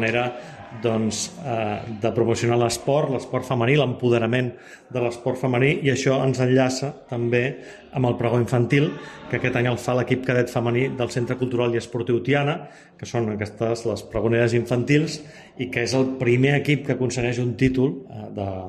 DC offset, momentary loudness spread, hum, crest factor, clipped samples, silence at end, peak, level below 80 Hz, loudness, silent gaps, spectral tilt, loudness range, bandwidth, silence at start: under 0.1%; 10 LU; none; 18 dB; under 0.1%; 0 s; -4 dBFS; -52 dBFS; -23 LUFS; none; -6 dB/octave; 2 LU; 13.5 kHz; 0 s